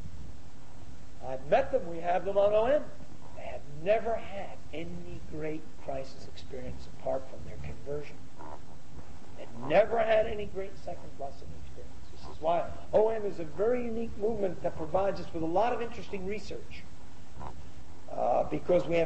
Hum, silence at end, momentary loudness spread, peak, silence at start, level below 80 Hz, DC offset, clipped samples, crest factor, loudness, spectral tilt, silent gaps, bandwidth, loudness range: none; 0 s; 23 LU; -12 dBFS; 0 s; -52 dBFS; 3%; under 0.1%; 20 dB; -32 LUFS; -6.5 dB/octave; none; 8.6 kHz; 9 LU